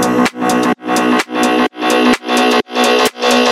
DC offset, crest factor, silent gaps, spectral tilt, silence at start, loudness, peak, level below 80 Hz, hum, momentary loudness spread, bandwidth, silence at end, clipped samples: under 0.1%; 12 dB; none; -3 dB/octave; 0 s; -13 LUFS; 0 dBFS; -50 dBFS; none; 3 LU; 16.5 kHz; 0 s; under 0.1%